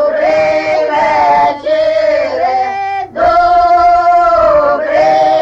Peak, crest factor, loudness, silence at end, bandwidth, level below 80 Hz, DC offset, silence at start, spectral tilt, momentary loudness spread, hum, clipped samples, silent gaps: 0 dBFS; 8 dB; -10 LUFS; 0 s; 7.8 kHz; -38 dBFS; under 0.1%; 0 s; -5 dB/octave; 5 LU; none; under 0.1%; none